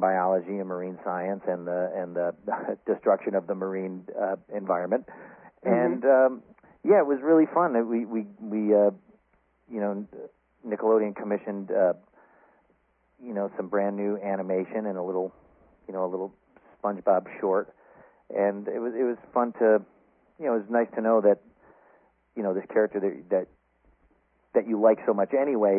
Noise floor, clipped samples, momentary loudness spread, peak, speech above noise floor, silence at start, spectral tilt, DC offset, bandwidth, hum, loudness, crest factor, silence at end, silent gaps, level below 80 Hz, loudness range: -68 dBFS; under 0.1%; 13 LU; -8 dBFS; 42 dB; 0 s; -12.5 dB/octave; under 0.1%; 2.9 kHz; none; -27 LUFS; 20 dB; 0 s; none; -74 dBFS; 7 LU